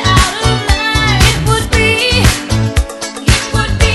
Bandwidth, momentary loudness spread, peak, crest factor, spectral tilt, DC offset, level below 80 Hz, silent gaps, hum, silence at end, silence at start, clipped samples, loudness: 12.5 kHz; 6 LU; 0 dBFS; 12 dB; -4 dB/octave; under 0.1%; -18 dBFS; none; none; 0 s; 0 s; 0.4%; -12 LUFS